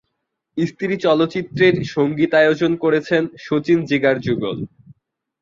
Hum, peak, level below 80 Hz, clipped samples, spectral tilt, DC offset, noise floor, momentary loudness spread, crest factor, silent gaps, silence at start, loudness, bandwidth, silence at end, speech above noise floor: none; -2 dBFS; -56 dBFS; under 0.1%; -7 dB/octave; under 0.1%; -75 dBFS; 9 LU; 16 dB; none; 0.55 s; -18 LUFS; 7.4 kHz; 0.5 s; 58 dB